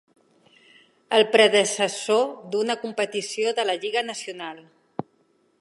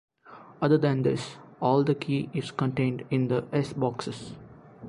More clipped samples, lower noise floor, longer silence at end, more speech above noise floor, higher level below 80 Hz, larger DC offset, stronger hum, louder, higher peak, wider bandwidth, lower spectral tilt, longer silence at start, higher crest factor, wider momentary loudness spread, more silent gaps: neither; first, -65 dBFS vs -50 dBFS; first, 0.6 s vs 0 s; first, 42 dB vs 24 dB; second, -78 dBFS vs -62 dBFS; neither; neither; first, -22 LUFS vs -27 LUFS; first, -4 dBFS vs -10 dBFS; about the same, 11.5 kHz vs 11 kHz; second, -2 dB/octave vs -7.5 dB/octave; first, 1.1 s vs 0.25 s; about the same, 22 dB vs 18 dB; first, 20 LU vs 13 LU; neither